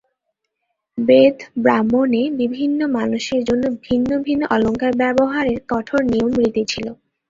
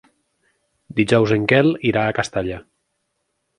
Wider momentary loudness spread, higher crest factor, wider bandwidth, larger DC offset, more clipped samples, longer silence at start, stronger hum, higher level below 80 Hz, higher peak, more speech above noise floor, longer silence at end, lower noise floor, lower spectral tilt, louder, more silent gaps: second, 7 LU vs 11 LU; about the same, 16 dB vs 20 dB; second, 7.6 kHz vs 11 kHz; neither; neither; about the same, 0.95 s vs 0.95 s; neither; about the same, -48 dBFS vs -50 dBFS; about the same, 0 dBFS vs 0 dBFS; about the same, 58 dB vs 55 dB; second, 0.35 s vs 0.95 s; about the same, -76 dBFS vs -73 dBFS; about the same, -5.5 dB/octave vs -6 dB/octave; about the same, -18 LUFS vs -18 LUFS; neither